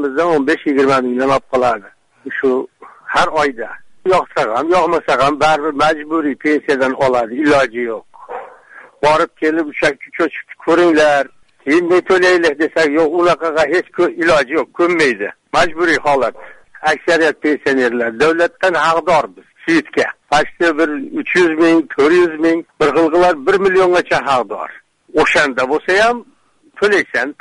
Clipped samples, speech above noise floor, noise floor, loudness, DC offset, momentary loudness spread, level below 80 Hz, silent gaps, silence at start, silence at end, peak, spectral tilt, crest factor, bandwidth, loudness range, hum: under 0.1%; 28 dB; -42 dBFS; -14 LUFS; under 0.1%; 9 LU; -48 dBFS; none; 0 s; 0.1 s; -2 dBFS; -4.5 dB/octave; 12 dB; 11 kHz; 3 LU; none